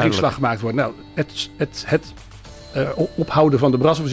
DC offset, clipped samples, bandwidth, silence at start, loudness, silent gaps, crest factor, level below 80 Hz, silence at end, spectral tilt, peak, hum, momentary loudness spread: under 0.1%; under 0.1%; 8 kHz; 0 s; -20 LUFS; none; 16 dB; -44 dBFS; 0 s; -6.5 dB/octave; -4 dBFS; none; 10 LU